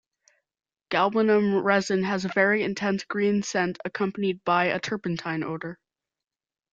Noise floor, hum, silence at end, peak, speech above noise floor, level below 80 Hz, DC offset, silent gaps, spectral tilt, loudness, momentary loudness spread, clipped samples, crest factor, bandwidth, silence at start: -67 dBFS; none; 1 s; -6 dBFS; 42 dB; -66 dBFS; under 0.1%; none; -5.5 dB/octave; -25 LUFS; 8 LU; under 0.1%; 20 dB; 8 kHz; 0.9 s